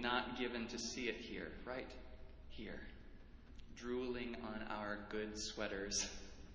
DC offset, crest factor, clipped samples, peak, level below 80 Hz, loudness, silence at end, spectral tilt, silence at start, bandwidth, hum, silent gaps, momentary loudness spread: under 0.1%; 24 dB; under 0.1%; -22 dBFS; -60 dBFS; -45 LUFS; 0 s; -3 dB/octave; 0 s; 8 kHz; none; none; 19 LU